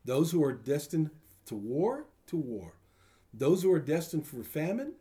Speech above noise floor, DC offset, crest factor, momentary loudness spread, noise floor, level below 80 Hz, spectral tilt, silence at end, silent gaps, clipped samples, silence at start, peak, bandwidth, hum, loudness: 34 dB; under 0.1%; 16 dB; 13 LU; -64 dBFS; -70 dBFS; -6.5 dB/octave; 0.1 s; none; under 0.1%; 0.05 s; -16 dBFS; over 20 kHz; none; -32 LUFS